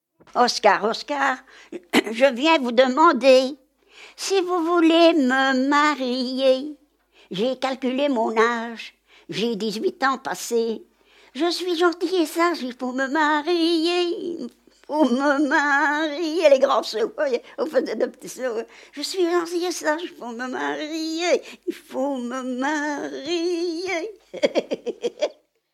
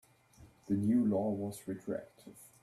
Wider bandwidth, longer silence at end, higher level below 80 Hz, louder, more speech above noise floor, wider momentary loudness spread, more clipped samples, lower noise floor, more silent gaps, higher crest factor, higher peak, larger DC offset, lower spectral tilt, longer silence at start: about the same, 15 kHz vs 14 kHz; first, 0.4 s vs 0.15 s; about the same, -74 dBFS vs -70 dBFS; first, -22 LUFS vs -35 LUFS; first, 36 dB vs 27 dB; second, 13 LU vs 24 LU; neither; second, -57 dBFS vs -61 dBFS; neither; first, 20 dB vs 14 dB; first, -2 dBFS vs -22 dBFS; neither; second, -3 dB/octave vs -8 dB/octave; about the same, 0.35 s vs 0.4 s